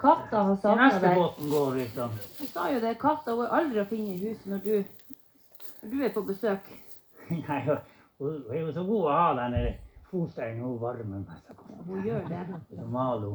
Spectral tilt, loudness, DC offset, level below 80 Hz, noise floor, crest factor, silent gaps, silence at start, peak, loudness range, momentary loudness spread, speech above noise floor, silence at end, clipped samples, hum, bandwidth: -7.5 dB/octave; -29 LUFS; under 0.1%; -50 dBFS; -52 dBFS; 22 dB; none; 0 s; -6 dBFS; 8 LU; 17 LU; 24 dB; 0 s; under 0.1%; none; over 20 kHz